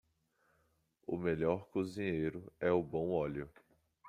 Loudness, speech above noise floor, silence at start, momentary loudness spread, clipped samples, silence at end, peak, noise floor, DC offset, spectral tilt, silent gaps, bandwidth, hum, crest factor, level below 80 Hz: -37 LUFS; 41 dB; 1.1 s; 10 LU; under 0.1%; 0 s; -18 dBFS; -77 dBFS; under 0.1%; -8 dB/octave; none; 11.5 kHz; none; 20 dB; -66 dBFS